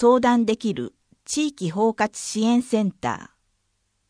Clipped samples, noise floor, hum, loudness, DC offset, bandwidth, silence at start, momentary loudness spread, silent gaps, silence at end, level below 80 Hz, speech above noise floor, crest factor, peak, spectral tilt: under 0.1%; -71 dBFS; none; -23 LUFS; under 0.1%; 10.5 kHz; 0 s; 10 LU; none; 0.85 s; -60 dBFS; 50 dB; 18 dB; -6 dBFS; -5 dB/octave